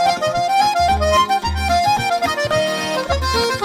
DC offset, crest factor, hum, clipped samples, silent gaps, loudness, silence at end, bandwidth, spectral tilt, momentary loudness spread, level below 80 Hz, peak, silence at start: under 0.1%; 12 dB; none; under 0.1%; none; -17 LUFS; 0 s; 16.5 kHz; -3.5 dB/octave; 4 LU; -30 dBFS; -4 dBFS; 0 s